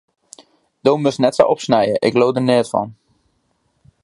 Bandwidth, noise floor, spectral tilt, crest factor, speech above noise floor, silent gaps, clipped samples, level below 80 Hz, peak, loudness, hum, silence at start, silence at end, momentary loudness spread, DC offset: 11.5 kHz; -65 dBFS; -6 dB/octave; 18 dB; 50 dB; none; under 0.1%; -58 dBFS; 0 dBFS; -16 LUFS; none; 0.85 s; 1.1 s; 7 LU; under 0.1%